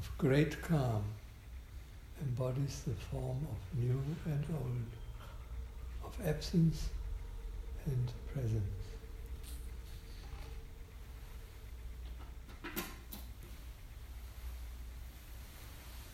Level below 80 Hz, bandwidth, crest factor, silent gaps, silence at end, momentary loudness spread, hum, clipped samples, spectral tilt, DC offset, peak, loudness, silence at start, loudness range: -48 dBFS; 16.5 kHz; 20 dB; none; 0 s; 18 LU; none; under 0.1%; -7 dB/octave; under 0.1%; -20 dBFS; -40 LUFS; 0 s; 11 LU